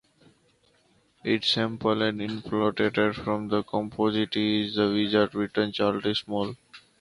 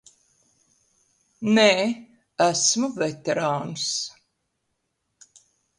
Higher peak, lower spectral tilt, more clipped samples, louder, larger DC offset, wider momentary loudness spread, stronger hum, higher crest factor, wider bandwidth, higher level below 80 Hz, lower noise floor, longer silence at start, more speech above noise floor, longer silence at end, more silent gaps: second, -8 dBFS vs -4 dBFS; first, -6 dB/octave vs -3 dB/octave; neither; second, -26 LUFS vs -22 LUFS; neither; second, 7 LU vs 14 LU; neither; about the same, 18 dB vs 22 dB; about the same, 11 kHz vs 11.5 kHz; first, -60 dBFS vs -70 dBFS; second, -65 dBFS vs -76 dBFS; second, 1.25 s vs 1.4 s; second, 39 dB vs 54 dB; second, 0.2 s vs 1.7 s; neither